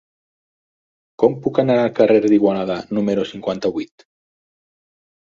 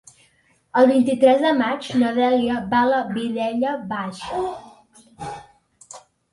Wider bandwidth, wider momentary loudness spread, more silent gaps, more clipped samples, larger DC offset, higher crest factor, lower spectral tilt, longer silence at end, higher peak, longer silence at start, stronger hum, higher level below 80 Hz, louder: second, 7.4 kHz vs 11.5 kHz; second, 10 LU vs 19 LU; neither; neither; neither; about the same, 18 dB vs 18 dB; first, -7.5 dB/octave vs -5.5 dB/octave; first, 1.45 s vs 0.35 s; about the same, -2 dBFS vs -4 dBFS; first, 1.2 s vs 0.75 s; neither; about the same, -58 dBFS vs -58 dBFS; about the same, -18 LUFS vs -20 LUFS